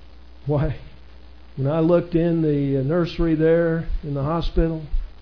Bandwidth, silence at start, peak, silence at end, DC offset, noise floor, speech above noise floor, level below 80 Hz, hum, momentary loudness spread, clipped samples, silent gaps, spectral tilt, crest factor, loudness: 5.4 kHz; 0 s; -6 dBFS; 0.1 s; 0.7%; -45 dBFS; 25 dB; -30 dBFS; none; 11 LU; under 0.1%; none; -10 dB/octave; 16 dB; -22 LUFS